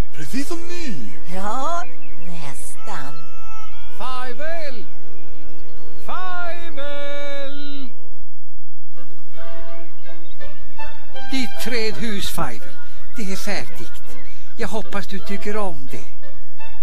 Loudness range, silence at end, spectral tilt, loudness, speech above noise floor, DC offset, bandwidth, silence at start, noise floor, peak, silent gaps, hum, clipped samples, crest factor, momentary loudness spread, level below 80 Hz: 8 LU; 0 s; -5 dB/octave; -30 LUFS; 24 dB; 50%; 15 kHz; 0 s; -52 dBFS; -2 dBFS; none; none; under 0.1%; 20 dB; 19 LU; -44 dBFS